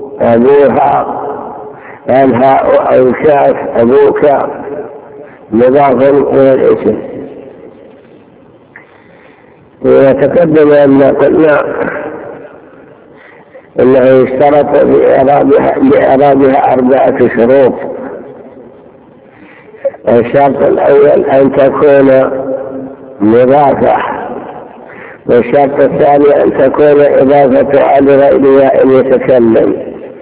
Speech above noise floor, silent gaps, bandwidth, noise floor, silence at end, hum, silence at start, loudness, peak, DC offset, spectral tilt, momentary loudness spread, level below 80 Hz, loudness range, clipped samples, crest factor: 33 dB; none; 4 kHz; -39 dBFS; 0 s; none; 0 s; -7 LUFS; 0 dBFS; under 0.1%; -11 dB/octave; 16 LU; -42 dBFS; 6 LU; 4%; 8 dB